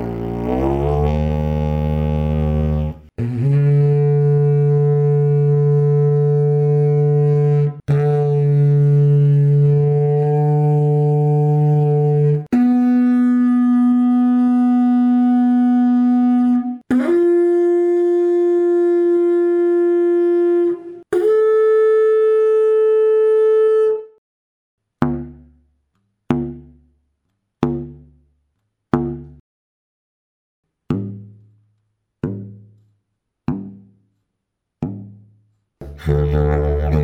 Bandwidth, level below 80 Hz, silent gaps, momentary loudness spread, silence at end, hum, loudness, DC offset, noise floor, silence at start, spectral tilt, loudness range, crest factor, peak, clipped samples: 3.9 kHz; -32 dBFS; 24.18-24.78 s, 29.40-30.63 s; 11 LU; 0 s; none; -16 LUFS; under 0.1%; -77 dBFS; 0 s; -11 dB/octave; 17 LU; 14 dB; -2 dBFS; under 0.1%